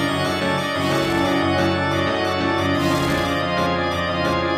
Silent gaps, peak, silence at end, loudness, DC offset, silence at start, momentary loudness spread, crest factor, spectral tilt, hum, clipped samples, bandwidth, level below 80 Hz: none; -6 dBFS; 0 s; -20 LUFS; under 0.1%; 0 s; 2 LU; 14 dB; -5 dB/octave; none; under 0.1%; 15.5 kHz; -44 dBFS